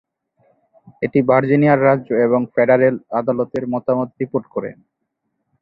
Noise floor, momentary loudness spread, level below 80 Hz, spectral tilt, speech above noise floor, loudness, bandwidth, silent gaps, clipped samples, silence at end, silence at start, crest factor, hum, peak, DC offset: -74 dBFS; 10 LU; -60 dBFS; -10.5 dB/octave; 58 dB; -17 LUFS; 5.2 kHz; none; under 0.1%; 0.9 s; 1 s; 16 dB; none; -2 dBFS; under 0.1%